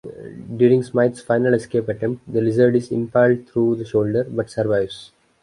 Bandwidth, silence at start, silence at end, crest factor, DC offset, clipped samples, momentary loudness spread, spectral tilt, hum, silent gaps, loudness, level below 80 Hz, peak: 11 kHz; 0.05 s; 0.4 s; 16 dB; under 0.1%; under 0.1%; 9 LU; -8 dB/octave; none; none; -19 LUFS; -56 dBFS; -4 dBFS